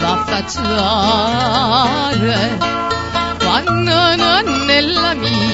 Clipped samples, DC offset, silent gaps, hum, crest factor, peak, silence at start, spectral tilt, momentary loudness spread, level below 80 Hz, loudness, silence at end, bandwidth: under 0.1%; 0.4%; none; none; 14 dB; 0 dBFS; 0 s; -4.5 dB/octave; 6 LU; -36 dBFS; -14 LUFS; 0 s; 8 kHz